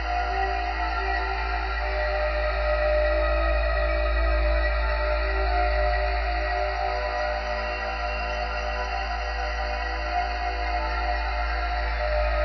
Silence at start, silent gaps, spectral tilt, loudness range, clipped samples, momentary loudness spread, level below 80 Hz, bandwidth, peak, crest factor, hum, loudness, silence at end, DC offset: 0 s; none; -3 dB/octave; 4 LU; under 0.1%; 5 LU; -28 dBFS; 6.2 kHz; -12 dBFS; 12 dB; none; -26 LUFS; 0 s; under 0.1%